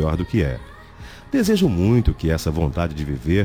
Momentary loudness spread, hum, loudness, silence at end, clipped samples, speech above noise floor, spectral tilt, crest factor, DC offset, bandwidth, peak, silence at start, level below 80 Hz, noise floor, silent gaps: 17 LU; none; -21 LUFS; 0 s; under 0.1%; 21 dB; -7 dB/octave; 14 dB; 0.1%; 18.5 kHz; -6 dBFS; 0 s; -32 dBFS; -40 dBFS; none